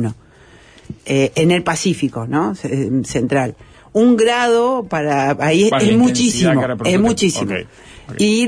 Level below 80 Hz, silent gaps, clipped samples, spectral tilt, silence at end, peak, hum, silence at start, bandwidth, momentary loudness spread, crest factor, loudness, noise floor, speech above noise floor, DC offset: -46 dBFS; none; under 0.1%; -5 dB/octave; 0 s; -4 dBFS; none; 0 s; 11 kHz; 8 LU; 12 dB; -16 LUFS; -45 dBFS; 30 dB; under 0.1%